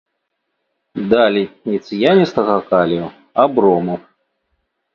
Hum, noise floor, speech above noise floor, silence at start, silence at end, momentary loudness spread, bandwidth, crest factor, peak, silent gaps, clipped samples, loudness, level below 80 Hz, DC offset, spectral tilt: none; -73 dBFS; 58 dB; 0.95 s; 0.95 s; 11 LU; 7 kHz; 16 dB; 0 dBFS; none; under 0.1%; -16 LUFS; -56 dBFS; under 0.1%; -7.5 dB/octave